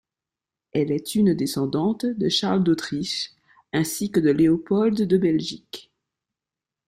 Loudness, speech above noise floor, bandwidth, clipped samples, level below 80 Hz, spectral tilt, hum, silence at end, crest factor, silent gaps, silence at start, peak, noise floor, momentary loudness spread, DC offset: -22 LUFS; 67 dB; 16 kHz; under 0.1%; -60 dBFS; -5.5 dB/octave; none; 1.05 s; 16 dB; none; 0.75 s; -8 dBFS; -89 dBFS; 9 LU; under 0.1%